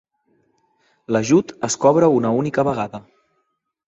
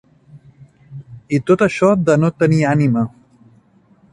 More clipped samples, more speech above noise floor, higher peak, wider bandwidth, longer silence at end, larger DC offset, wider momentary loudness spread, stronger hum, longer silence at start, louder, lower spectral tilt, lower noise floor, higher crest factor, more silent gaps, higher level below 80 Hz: neither; first, 54 dB vs 38 dB; about the same, -2 dBFS vs -2 dBFS; second, 8.4 kHz vs 11 kHz; second, 0.9 s vs 1.05 s; neither; second, 11 LU vs 23 LU; neither; first, 1.1 s vs 0.35 s; second, -18 LUFS vs -15 LUFS; second, -5.5 dB/octave vs -7.5 dB/octave; first, -72 dBFS vs -52 dBFS; about the same, 20 dB vs 16 dB; neither; second, -58 dBFS vs -52 dBFS